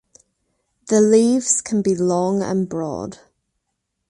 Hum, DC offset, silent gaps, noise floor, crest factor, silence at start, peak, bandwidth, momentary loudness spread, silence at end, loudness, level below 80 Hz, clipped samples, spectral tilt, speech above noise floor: none; under 0.1%; none; -76 dBFS; 16 dB; 0.85 s; -4 dBFS; 11.5 kHz; 13 LU; 0.95 s; -18 LUFS; -58 dBFS; under 0.1%; -5 dB/octave; 58 dB